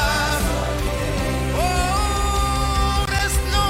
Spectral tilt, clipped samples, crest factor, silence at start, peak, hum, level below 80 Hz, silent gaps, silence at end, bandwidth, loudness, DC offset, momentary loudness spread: -4 dB/octave; under 0.1%; 12 dB; 0 s; -8 dBFS; none; -24 dBFS; none; 0 s; 16 kHz; -21 LUFS; under 0.1%; 3 LU